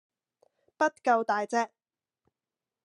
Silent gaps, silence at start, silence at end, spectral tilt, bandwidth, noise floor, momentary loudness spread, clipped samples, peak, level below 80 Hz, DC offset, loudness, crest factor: none; 0.8 s; 1.2 s; -3.5 dB/octave; 11 kHz; under -90 dBFS; 5 LU; under 0.1%; -12 dBFS; under -90 dBFS; under 0.1%; -28 LUFS; 20 dB